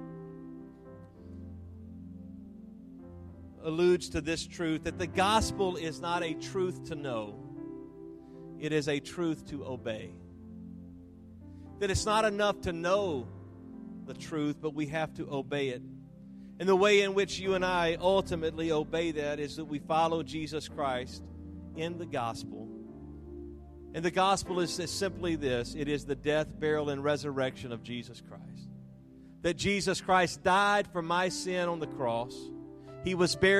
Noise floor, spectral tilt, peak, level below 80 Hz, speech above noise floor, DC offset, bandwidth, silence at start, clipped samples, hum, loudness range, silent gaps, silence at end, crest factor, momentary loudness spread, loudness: -53 dBFS; -4.5 dB/octave; -12 dBFS; -56 dBFS; 22 dB; under 0.1%; 13.5 kHz; 0 s; under 0.1%; none; 8 LU; none; 0 s; 20 dB; 21 LU; -31 LUFS